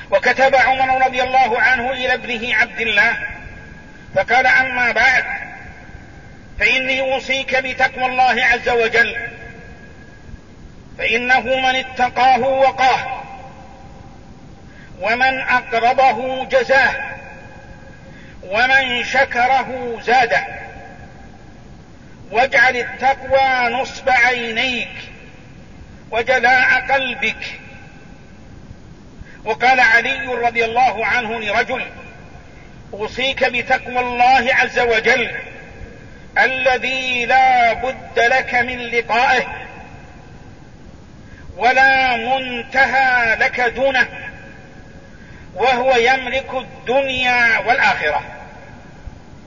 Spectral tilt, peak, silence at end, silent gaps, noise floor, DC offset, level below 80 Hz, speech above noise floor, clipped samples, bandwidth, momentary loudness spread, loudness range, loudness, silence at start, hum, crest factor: -3 dB/octave; -2 dBFS; 0.1 s; none; -40 dBFS; 0.6%; -44 dBFS; 24 dB; under 0.1%; 7.4 kHz; 16 LU; 3 LU; -15 LUFS; 0 s; none; 16 dB